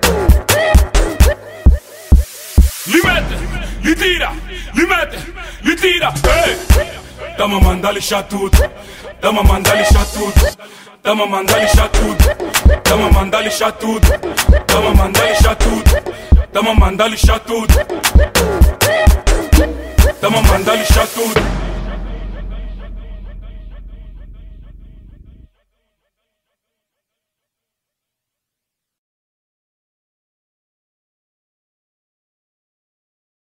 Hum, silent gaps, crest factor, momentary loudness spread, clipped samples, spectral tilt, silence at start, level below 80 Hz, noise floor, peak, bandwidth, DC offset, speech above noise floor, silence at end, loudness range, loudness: none; none; 14 dB; 14 LU; under 0.1%; -4.5 dB/octave; 0 s; -16 dBFS; -82 dBFS; 0 dBFS; 16.5 kHz; under 0.1%; 70 dB; 8.65 s; 4 LU; -13 LUFS